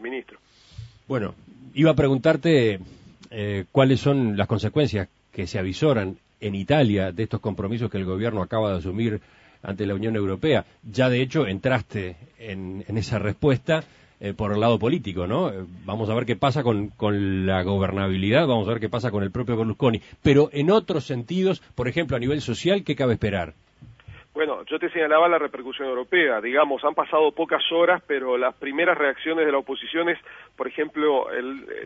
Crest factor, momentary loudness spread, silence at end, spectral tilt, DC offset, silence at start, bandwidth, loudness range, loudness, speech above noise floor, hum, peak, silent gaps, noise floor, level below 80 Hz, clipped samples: 20 dB; 13 LU; 0 s; -7 dB/octave; under 0.1%; 0 s; 8 kHz; 4 LU; -23 LUFS; 23 dB; none; -4 dBFS; none; -46 dBFS; -52 dBFS; under 0.1%